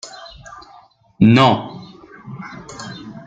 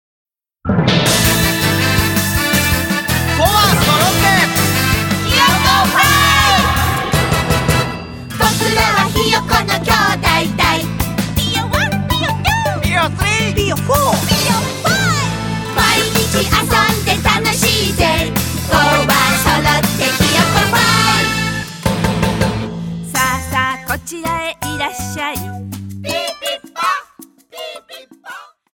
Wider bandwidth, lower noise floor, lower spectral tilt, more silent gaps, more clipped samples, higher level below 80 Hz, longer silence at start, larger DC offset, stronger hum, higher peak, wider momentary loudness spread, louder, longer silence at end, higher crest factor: second, 8.8 kHz vs 17.5 kHz; first, -48 dBFS vs -42 dBFS; first, -6.5 dB/octave vs -3.5 dB/octave; neither; neither; second, -52 dBFS vs -30 dBFS; second, 0.05 s vs 0.65 s; neither; neither; about the same, 0 dBFS vs 0 dBFS; first, 26 LU vs 10 LU; about the same, -14 LUFS vs -14 LUFS; second, 0.15 s vs 0.3 s; about the same, 18 dB vs 14 dB